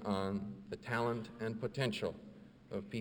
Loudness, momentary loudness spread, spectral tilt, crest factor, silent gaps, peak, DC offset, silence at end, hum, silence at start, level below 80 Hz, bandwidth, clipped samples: -40 LUFS; 13 LU; -6 dB/octave; 20 dB; none; -20 dBFS; under 0.1%; 0 s; none; 0 s; -68 dBFS; over 20 kHz; under 0.1%